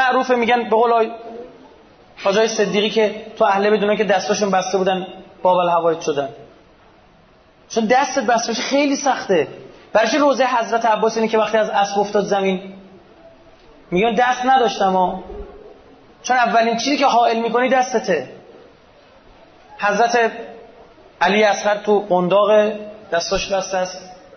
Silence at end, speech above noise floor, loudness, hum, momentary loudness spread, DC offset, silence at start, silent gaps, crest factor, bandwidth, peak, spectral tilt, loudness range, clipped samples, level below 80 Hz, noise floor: 0.2 s; 34 dB; -17 LUFS; none; 10 LU; under 0.1%; 0 s; none; 14 dB; 6.6 kHz; -4 dBFS; -4 dB/octave; 3 LU; under 0.1%; -52 dBFS; -50 dBFS